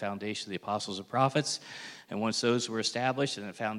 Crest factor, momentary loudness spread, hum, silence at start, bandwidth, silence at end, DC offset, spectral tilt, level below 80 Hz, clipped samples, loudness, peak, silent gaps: 20 dB; 9 LU; none; 0 s; 15.5 kHz; 0 s; under 0.1%; -4 dB/octave; -78 dBFS; under 0.1%; -31 LUFS; -12 dBFS; none